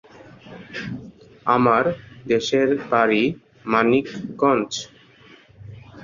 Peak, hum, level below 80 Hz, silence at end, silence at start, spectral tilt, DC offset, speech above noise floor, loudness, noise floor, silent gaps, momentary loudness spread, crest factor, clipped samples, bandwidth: -2 dBFS; none; -58 dBFS; 0 s; 0.45 s; -5 dB/octave; under 0.1%; 30 dB; -20 LUFS; -50 dBFS; none; 20 LU; 20 dB; under 0.1%; 7.4 kHz